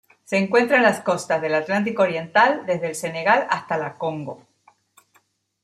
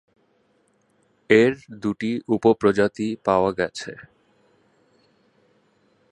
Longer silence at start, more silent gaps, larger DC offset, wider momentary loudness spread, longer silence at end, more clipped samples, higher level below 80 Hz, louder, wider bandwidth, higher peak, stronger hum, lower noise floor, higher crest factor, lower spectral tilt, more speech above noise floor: second, 0.3 s vs 1.3 s; neither; neither; second, 10 LU vs 13 LU; second, 1.25 s vs 2.1 s; neither; second, -70 dBFS vs -58 dBFS; about the same, -21 LUFS vs -21 LUFS; first, 14 kHz vs 11 kHz; about the same, -2 dBFS vs -2 dBFS; neither; about the same, -63 dBFS vs -64 dBFS; about the same, 20 dB vs 22 dB; second, -4.5 dB/octave vs -6 dB/octave; about the same, 43 dB vs 44 dB